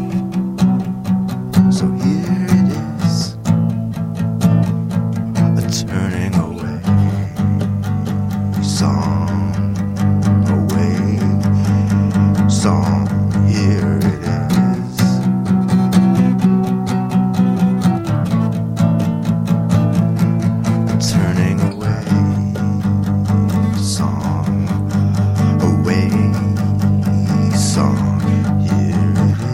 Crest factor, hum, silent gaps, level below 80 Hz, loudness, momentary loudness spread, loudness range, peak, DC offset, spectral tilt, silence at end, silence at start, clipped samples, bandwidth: 14 dB; none; none; -40 dBFS; -16 LUFS; 5 LU; 3 LU; 0 dBFS; under 0.1%; -7 dB/octave; 0 s; 0 s; under 0.1%; 15.5 kHz